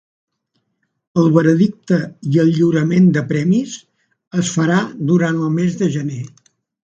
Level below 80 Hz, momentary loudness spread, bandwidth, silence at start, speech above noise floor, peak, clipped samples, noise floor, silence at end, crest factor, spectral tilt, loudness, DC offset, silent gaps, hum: -58 dBFS; 11 LU; 8 kHz; 1.15 s; 54 dB; 0 dBFS; under 0.1%; -69 dBFS; 0.55 s; 16 dB; -7 dB/octave; -16 LUFS; under 0.1%; 4.27-4.31 s; none